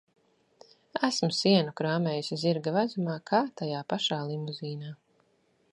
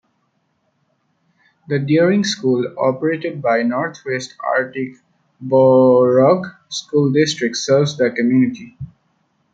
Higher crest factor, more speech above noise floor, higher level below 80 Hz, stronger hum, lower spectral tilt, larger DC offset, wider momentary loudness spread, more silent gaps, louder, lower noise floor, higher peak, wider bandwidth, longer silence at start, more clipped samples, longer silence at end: first, 22 dB vs 16 dB; second, 41 dB vs 50 dB; second, -78 dBFS vs -60 dBFS; neither; about the same, -5.5 dB/octave vs -5.5 dB/octave; neither; second, 12 LU vs 15 LU; neither; second, -29 LUFS vs -16 LUFS; about the same, -69 dBFS vs -66 dBFS; second, -8 dBFS vs -2 dBFS; first, 11 kHz vs 8.8 kHz; second, 0.95 s vs 1.7 s; neither; about the same, 0.75 s vs 0.65 s